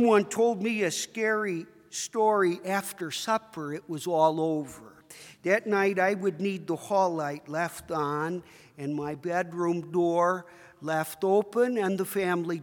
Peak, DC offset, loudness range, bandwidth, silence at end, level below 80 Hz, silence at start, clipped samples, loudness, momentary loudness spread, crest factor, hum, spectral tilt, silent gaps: -10 dBFS; under 0.1%; 3 LU; 18 kHz; 0 s; -72 dBFS; 0 s; under 0.1%; -28 LUFS; 11 LU; 18 dB; none; -5 dB/octave; none